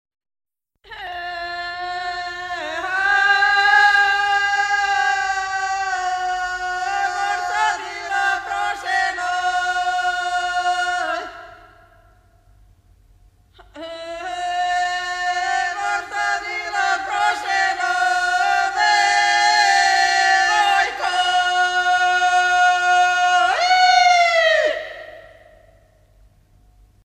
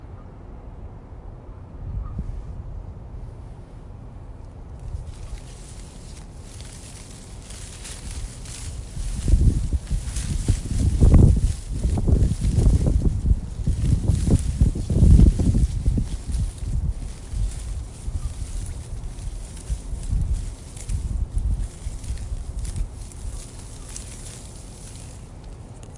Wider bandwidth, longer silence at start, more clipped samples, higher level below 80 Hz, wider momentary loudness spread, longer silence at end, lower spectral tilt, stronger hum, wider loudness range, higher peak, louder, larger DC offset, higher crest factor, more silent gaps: first, 13.5 kHz vs 11.5 kHz; first, 0.9 s vs 0 s; neither; second, -54 dBFS vs -26 dBFS; second, 13 LU vs 21 LU; first, 1.8 s vs 0 s; second, 0 dB/octave vs -7 dB/octave; neither; second, 10 LU vs 18 LU; about the same, -2 dBFS vs -4 dBFS; first, -18 LUFS vs -24 LUFS; neither; about the same, 16 dB vs 20 dB; neither